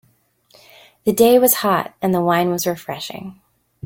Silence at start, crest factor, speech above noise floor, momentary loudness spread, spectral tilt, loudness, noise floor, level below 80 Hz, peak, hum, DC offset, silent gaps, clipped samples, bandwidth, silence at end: 1.05 s; 18 dB; 42 dB; 17 LU; -4.5 dB/octave; -17 LUFS; -59 dBFS; -58 dBFS; -2 dBFS; none; under 0.1%; none; under 0.1%; 17 kHz; 0.55 s